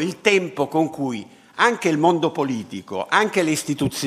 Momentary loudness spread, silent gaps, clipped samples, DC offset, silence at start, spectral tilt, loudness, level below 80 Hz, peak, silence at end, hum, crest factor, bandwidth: 11 LU; none; under 0.1%; under 0.1%; 0 s; -4.5 dB/octave; -21 LUFS; -58 dBFS; 0 dBFS; 0 s; none; 20 dB; 15.5 kHz